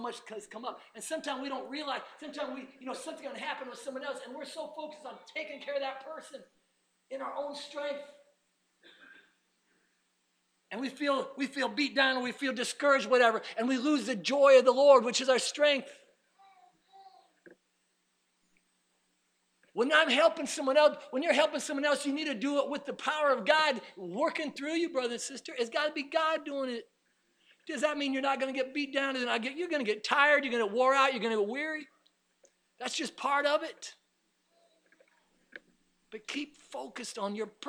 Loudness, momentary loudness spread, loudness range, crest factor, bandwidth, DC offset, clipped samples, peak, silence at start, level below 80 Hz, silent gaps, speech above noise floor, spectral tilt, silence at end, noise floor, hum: -30 LUFS; 17 LU; 16 LU; 22 dB; 13.5 kHz; under 0.1%; under 0.1%; -10 dBFS; 0 s; -86 dBFS; none; 46 dB; -2.5 dB/octave; 0 s; -76 dBFS; none